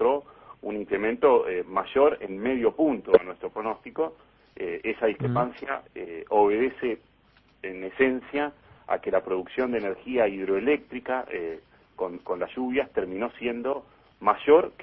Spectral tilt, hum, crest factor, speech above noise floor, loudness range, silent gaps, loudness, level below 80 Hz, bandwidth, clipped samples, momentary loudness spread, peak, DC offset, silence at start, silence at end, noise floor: -10 dB/octave; none; 22 dB; 35 dB; 5 LU; none; -27 LUFS; -60 dBFS; 4.5 kHz; under 0.1%; 13 LU; -4 dBFS; under 0.1%; 0 s; 0 s; -61 dBFS